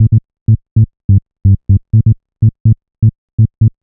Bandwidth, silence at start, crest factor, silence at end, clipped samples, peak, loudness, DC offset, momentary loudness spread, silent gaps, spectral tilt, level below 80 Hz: 0.6 kHz; 0 s; 10 dB; 0.15 s; under 0.1%; 0 dBFS; -13 LUFS; under 0.1%; 4 LU; 0.41-0.46 s, 0.71-0.76 s, 1.04-1.09 s, 2.60-2.65 s, 3.18-3.38 s; -18 dB/octave; -28 dBFS